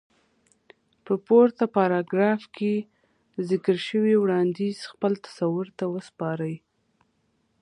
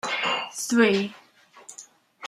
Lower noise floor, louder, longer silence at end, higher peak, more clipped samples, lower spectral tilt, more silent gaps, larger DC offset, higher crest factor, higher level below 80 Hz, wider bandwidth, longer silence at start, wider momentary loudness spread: first, -70 dBFS vs -50 dBFS; about the same, -25 LUFS vs -23 LUFS; first, 1.05 s vs 0 s; about the same, -6 dBFS vs -4 dBFS; neither; first, -7.5 dB/octave vs -3.5 dB/octave; neither; neither; about the same, 20 dB vs 22 dB; about the same, -74 dBFS vs -72 dBFS; second, 11 kHz vs 15 kHz; first, 1.05 s vs 0.05 s; second, 11 LU vs 23 LU